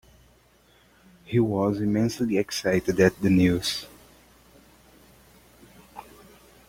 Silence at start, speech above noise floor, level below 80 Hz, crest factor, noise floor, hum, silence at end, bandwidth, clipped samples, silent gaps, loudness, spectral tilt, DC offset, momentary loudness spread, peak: 1.3 s; 36 dB; -54 dBFS; 22 dB; -59 dBFS; none; 0.65 s; 16.5 kHz; under 0.1%; none; -24 LUFS; -6 dB/octave; under 0.1%; 25 LU; -6 dBFS